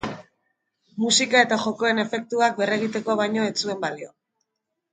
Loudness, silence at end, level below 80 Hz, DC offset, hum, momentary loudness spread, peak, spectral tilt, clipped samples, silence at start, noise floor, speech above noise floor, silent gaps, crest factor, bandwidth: -22 LUFS; 0.85 s; -64 dBFS; under 0.1%; none; 18 LU; -4 dBFS; -2.5 dB/octave; under 0.1%; 0.05 s; -80 dBFS; 58 dB; none; 22 dB; 9.6 kHz